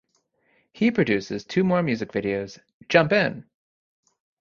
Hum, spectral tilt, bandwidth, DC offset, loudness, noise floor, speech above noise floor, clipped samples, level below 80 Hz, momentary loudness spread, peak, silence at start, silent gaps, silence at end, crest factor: none; -6.5 dB/octave; 7.2 kHz; under 0.1%; -23 LUFS; -69 dBFS; 46 dB; under 0.1%; -60 dBFS; 9 LU; -2 dBFS; 0.75 s; 2.74-2.80 s; 1 s; 24 dB